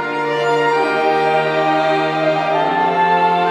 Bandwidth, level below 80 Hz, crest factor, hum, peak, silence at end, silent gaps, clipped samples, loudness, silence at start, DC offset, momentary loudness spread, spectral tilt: 11.5 kHz; -70 dBFS; 12 dB; none; -4 dBFS; 0 s; none; under 0.1%; -16 LUFS; 0 s; under 0.1%; 3 LU; -5.5 dB/octave